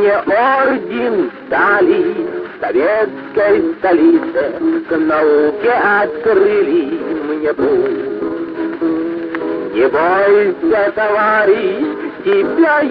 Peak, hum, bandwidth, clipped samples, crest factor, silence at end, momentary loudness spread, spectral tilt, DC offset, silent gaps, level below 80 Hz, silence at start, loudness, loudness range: 0 dBFS; none; 5.2 kHz; under 0.1%; 14 dB; 0 s; 9 LU; -8.5 dB/octave; under 0.1%; none; -52 dBFS; 0 s; -14 LUFS; 3 LU